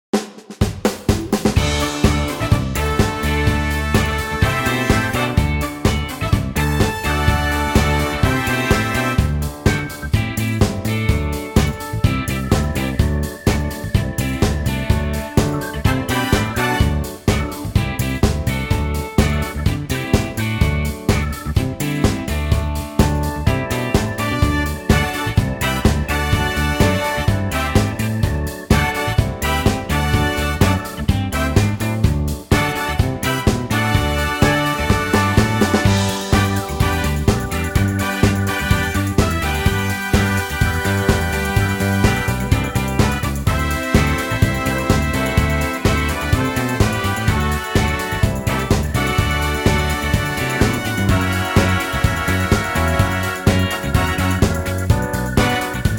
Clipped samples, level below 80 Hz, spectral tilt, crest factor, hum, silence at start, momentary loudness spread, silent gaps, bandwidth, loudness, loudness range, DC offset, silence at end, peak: under 0.1%; -26 dBFS; -5.5 dB/octave; 14 dB; none; 0.15 s; 4 LU; none; 18 kHz; -18 LUFS; 2 LU; under 0.1%; 0 s; -2 dBFS